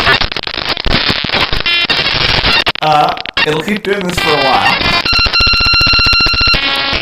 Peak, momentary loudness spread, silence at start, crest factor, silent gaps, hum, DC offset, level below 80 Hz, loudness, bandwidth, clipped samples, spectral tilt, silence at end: 0 dBFS; 8 LU; 0 s; 12 dB; none; none; under 0.1%; -24 dBFS; -10 LUFS; 16.5 kHz; under 0.1%; -3.5 dB/octave; 0 s